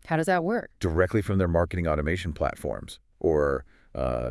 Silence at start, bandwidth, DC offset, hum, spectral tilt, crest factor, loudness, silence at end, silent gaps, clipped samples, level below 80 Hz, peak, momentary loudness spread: 0.05 s; 12 kHz; under 0.1%; none; -7 dB/octave; 18 dB; -27 LUFS; 0 s; none; under 0.1%; -42 dBFS; -8 dBFS; 10 LU